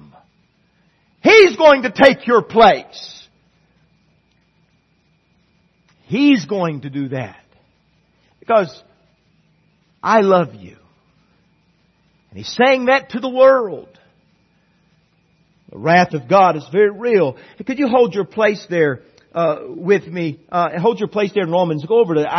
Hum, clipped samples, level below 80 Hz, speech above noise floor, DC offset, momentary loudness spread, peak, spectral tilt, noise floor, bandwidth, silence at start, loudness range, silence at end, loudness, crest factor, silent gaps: none; under 0.1%; -58 dBFS; 45 dB; under 0.1%; 15 LU; 0 dBFS; -6 dB/octave; -60 dBFS; 6.4 kHz; 1.25 s; 9 LU; 0 s; -15 LUFS; 18 dB; none